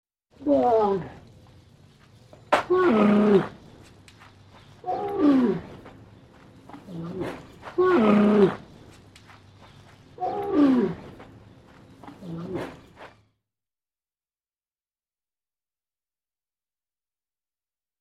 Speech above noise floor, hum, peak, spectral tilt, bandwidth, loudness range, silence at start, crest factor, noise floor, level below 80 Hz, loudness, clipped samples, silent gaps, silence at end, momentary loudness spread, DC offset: over 71 dB; none; -6 dBFS; -8 dB/octave; 9.6 kHz; 18 LU; 0.4 s; 22 dB; under -90 dBFS; -60 dBFS; -23 LUFS; under 0.1%; none; 4.95 s; 21 LU; under 0.1%